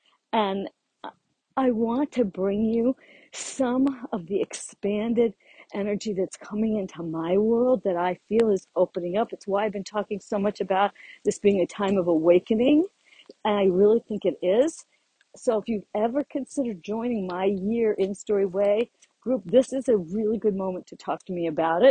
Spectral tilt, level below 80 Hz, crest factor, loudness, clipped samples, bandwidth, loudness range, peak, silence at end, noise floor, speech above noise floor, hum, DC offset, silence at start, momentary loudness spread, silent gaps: -6 dB/octave; -62 dBFS; 18 dB; -25 LUFS; under 0.1%; 9.8 kHz; 5 LU; -6 dBFS; 0 s; -47 dBFS; 22 dB; none; under 0.1%; 0.35 s; 11 LU; none